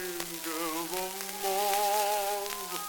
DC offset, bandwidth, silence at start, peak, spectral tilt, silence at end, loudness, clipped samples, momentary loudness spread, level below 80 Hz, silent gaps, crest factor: under 0.1%; 19 kHz; 0 s; -10 dBFS; -1 dB/octave; 0 s; -31 LUFS; under 0.1%; 8 LU; -64 dBFS; none; 22 dB